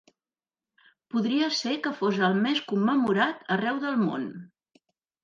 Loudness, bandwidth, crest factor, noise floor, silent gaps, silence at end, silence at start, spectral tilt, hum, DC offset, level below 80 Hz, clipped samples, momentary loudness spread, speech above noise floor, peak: -26 LUFS; 7.6 kHz; 18 dB; under -90 dBFS; none; 0.75 s; 1.15 s; -5.5 dB/octave; none; under 0.1%; -76 dBFS; under 0.1%; 7 LU; over 64 dB; -10 dBFS